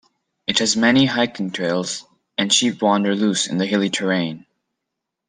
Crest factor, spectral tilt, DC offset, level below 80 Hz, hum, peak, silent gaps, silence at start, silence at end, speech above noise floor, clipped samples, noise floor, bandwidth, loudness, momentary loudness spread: 18 dB; -3.5 dB/octave; under 0.1%; -62 dBFS; none; -2 dBFS; none; 0.5 s; 0.9 s; 62 dB; under 0.1%; -81 dBFS; 10 kHz; -19 LUFS; 12 LU